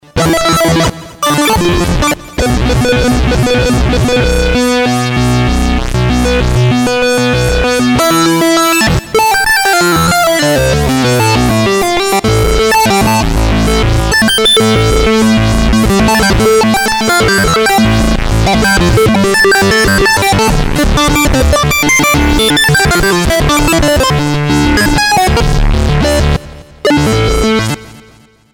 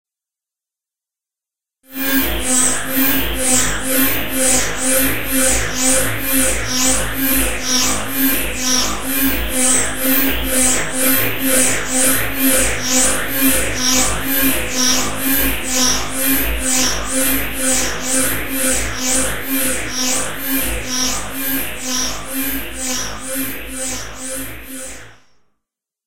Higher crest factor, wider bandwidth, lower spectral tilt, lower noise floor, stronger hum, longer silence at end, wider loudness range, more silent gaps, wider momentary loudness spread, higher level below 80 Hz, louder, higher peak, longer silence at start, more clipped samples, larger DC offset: second, 8 dB vs 18 dB; first, over 20 kHz vs 16 kHz; first, -4.5 dB/octave vs -1.5 dB/octave; second, -42 dBFS vs -87 dBFS; neither; first, 0.55 s vs 0 s; second, 2 LU vs 6 LU; neither; second, 4 LU vs 8 LU; first, -18 dBFS vs -32 dBFS; first, -9 LUFS vs -16 LUFS; about the same, -2 dBFS vs 0 dBFS; about the same, 0.15 s vs 0.05 s; neither; second, under 0.1% vs 7%